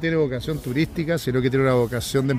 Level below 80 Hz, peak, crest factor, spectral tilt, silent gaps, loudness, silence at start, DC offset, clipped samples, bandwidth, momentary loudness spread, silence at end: -44 dBFS; -8 dBFS; 14 dB; -6.5 dB/octave; none; -22 LUFS; 0 s; under 0.1%; under 0.1%; 16 kHz; 5 LU; 0 s